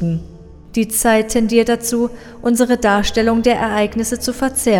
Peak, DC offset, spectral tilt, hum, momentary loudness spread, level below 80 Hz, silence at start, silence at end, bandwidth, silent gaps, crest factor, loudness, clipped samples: 0 dBFS; under 0.1%; -4 dB/octave; none; 8 LU; -36 dBFS; 0 s; 0 s; 18 kHz; none; 16 dB; -16 LUFS; under 0.1%